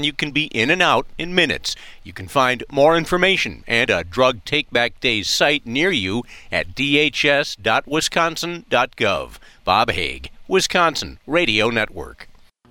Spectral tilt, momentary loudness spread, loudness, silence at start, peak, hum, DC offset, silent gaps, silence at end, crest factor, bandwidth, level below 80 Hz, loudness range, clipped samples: -3.5 dB/octave; 11 LU; -18 LUFS; 0 s; -2 dBFS; none; under 0.1%; none; 0.45 s; 16 dB; 17.5 kHz; -44 dBFS; 2 LU; under 0.1%